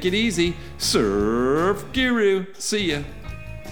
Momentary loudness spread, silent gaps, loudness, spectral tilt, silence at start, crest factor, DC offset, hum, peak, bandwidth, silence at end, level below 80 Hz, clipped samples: 14 LU; none; -22 LUFS; -4 dB/octave; 0 s; 16 dB; 1%; none; -6 dBFS; over 20 kHz; 0 s; -40 dBFS; under 0.1%